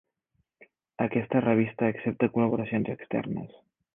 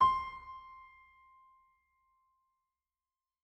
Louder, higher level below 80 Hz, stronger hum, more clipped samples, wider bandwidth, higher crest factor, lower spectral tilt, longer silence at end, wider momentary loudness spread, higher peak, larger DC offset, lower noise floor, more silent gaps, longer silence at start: first, -28 LUFS vs -36 LUFS; about the same, -64 dBFS vs -64 dBFS; neither; neither; second, 3.7 kHz vs 8.2 kHz; about the same, 20 dB vs 22 dB; first, -11 dB/octave vs -4.5 dB/octave; second, 0.5 s vs 2.7 s; second, 9 LU vs 25 LU; first, -10 dBFS vs -18 dBFS; neither; second, -76 dBFS vs under -90 dBFS; neither; first, 0.6 s vs 0 s